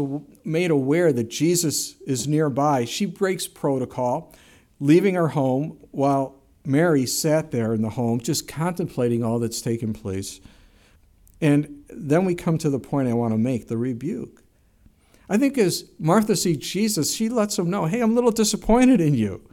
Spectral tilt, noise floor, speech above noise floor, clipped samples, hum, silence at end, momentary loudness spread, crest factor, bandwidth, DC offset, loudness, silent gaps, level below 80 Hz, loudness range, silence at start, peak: -5.5 dB/octave; -56 dBFS; 35 dB; under 0.1%; none; 0.15 s; 8 LU; 18 dB; 17.5 kHz; under 0.1%; -22 LUFS; none; -48 dBFS; 4 LU; 0 s; -4 dBFS